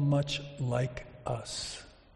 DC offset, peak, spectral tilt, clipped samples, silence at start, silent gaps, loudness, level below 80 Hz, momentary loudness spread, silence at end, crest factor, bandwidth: under 0.1%; -16 dBFS; -5.5 dB/octave; under 0.1%; 0 s; none; -34 LUFS; -54 dBFS; 10 LU; 0.2 s; 16 dB; 11.5 kHz